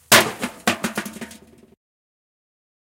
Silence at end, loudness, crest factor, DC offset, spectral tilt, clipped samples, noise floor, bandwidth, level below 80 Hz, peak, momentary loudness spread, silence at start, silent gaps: 1.6 s; -20 LUFS; 24 dB; under 0.1%; -1.5 dB/octave; under 0.1%; -46 dBFS; 17 kHz; -56 dBFS; 0 dBFS; 22 LU; 0.1 s; none